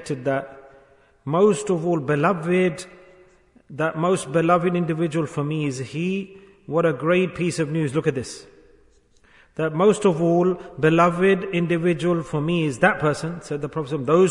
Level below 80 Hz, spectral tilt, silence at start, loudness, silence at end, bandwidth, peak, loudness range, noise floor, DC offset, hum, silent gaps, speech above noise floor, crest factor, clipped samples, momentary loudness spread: -56 dBFS; -6.5 dB/octave; 0 s; -22 LUFS; 0 s; 11 kHz; -4 dBFS; 4 LU; -56 dBFS; under 0.1%; none; none; 35 dB; 18 dB; under 0.1%; 11 LU